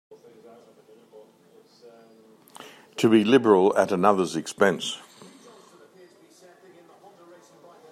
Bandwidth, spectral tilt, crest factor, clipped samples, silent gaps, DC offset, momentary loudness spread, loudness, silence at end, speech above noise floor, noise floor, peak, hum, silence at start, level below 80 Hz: 15 kHz; -5 dB/octave; 22 dB; under 0.1%; none; under 0.1%; 24 LU; -21 LUFS; 2.95 s; 36 dB; -56 dBFS; -4 dBFS; none; 2.6 s; -74 dBFS